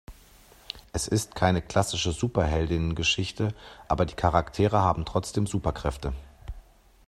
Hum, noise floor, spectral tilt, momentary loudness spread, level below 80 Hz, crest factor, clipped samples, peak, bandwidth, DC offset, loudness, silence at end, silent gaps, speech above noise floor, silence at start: none; -54 dBFS; -5 dB/octave; 17 LU; -40 dBFS; 22 dB; under 0.1%; -6 dBFS; 14 kHz; under 0.1%; -27 LUFS; 0.45 s; none; 28 dB; 0.1 s